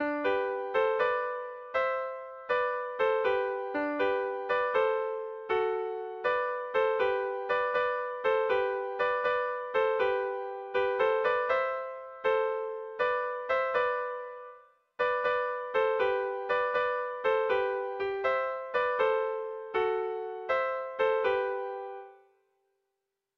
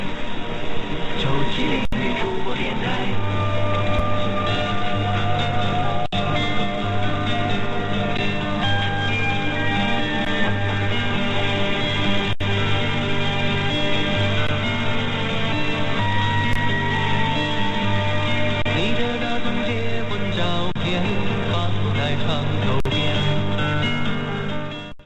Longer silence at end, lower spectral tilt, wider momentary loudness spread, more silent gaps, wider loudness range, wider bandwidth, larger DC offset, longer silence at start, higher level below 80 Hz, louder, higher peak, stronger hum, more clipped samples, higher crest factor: first, 1.25 s vs 0.05 s; about the same, -5 dB/octave vs -6 dB/octave; first, 8 LU vs 3 LU; neither; about the same, 2 LU vs 2 LU; second, 6 kHz vs 8.6 kHz; neither; about the same, 0 s vs 0 s; second, -68 dBFS vs -36 dBFS; second, -30 LUFS vs -22 LUFS; second, -16 dBFS vs -6 dBFS; neither; neither; about the same, 16 dB vs 12 dB